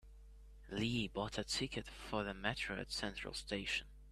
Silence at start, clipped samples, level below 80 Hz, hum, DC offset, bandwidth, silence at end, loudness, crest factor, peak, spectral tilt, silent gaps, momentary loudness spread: 0.05 s; under 0.1%; -56 dBFS; none; under 0.1%; 15 kHz; 0 s; -41 LUFS; 24 dB; -20 dBFS; -4 dB/octave; none; 6 LU